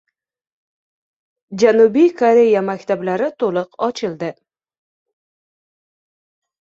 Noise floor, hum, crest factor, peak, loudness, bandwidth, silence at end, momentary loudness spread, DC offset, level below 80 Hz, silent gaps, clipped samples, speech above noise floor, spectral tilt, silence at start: under -90 dBFS; none; 18 dB; -2 dBFS; -16 LUFS; 7.6 kHz; 2.35 s; 12 LU; under 0.1%; -66 dBFS; none; under 0.1%; over 75 dB; -6 dB/octave; 1.5 s